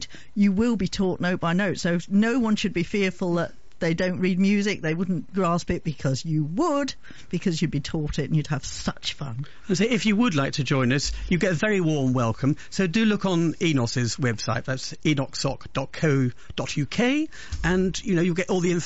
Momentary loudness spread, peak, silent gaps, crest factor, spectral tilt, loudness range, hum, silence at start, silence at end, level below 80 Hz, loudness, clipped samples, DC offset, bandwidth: 8 LU; -10 dBFS; none; 14 dB; -5.5 dB/octave; 3 LU; none; 0 s; 0 s; -44 dBFS; -25 LUFS; under 0.1%; 1%; 8 kHz